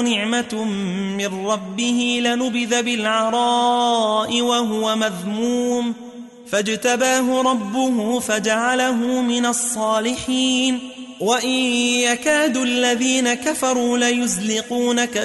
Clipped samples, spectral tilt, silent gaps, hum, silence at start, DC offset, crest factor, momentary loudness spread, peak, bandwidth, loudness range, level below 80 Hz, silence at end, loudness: under 0.1%; -2.5 dB/octave; none; none; 0 s; under 0.1%; 14 dB; 6 LU; -4 dBFS; 12 kHz; 2 LU; -60 dBFS; 0 s; -19 LUFS